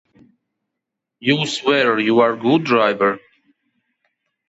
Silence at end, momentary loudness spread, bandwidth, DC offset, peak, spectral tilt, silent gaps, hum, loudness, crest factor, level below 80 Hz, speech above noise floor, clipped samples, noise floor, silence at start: 1.3 s; 5 LU; 8.2 kHz; under 0.1%; -4 dBFS; -5 dB/octave; none; none; -17 LUFS; 16 dB; -68 dBFS; 65 dB; under 0.1%; -81 dBFS; 1.2 s